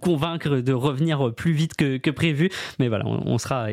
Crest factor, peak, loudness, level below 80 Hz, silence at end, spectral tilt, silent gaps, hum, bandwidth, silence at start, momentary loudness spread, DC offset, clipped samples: 16 dB; -8 dBFS; -23 LUFS; -54 dBFS; 0 s; -6.5 dB/octave; none; none; 15 kHz; 0 s; 3 LU; under 0.1%; under 0.1%